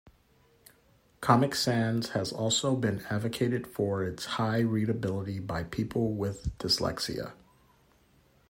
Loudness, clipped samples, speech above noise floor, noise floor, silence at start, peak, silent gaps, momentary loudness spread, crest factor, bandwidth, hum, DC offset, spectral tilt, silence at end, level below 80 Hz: -30 LUFS; under 0.1%; 35 dB; -64 dBFS; 1.2 s; -8 dBFS; none; 8 LU; 24 dB; 16 kHz; none; under 0.1%; -5 dB/octave; 1.15 s; -54 dBFS